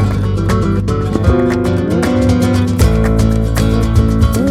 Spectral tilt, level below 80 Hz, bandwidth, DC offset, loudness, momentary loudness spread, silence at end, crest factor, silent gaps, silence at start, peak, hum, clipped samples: -7 dB/octave; -18 dBFS; 15 kHz; under 0.1%; -13 LUFS; 3 LU; 0 s; 12 dB; none; 0 s; 0 dBFS; none; under 0.1%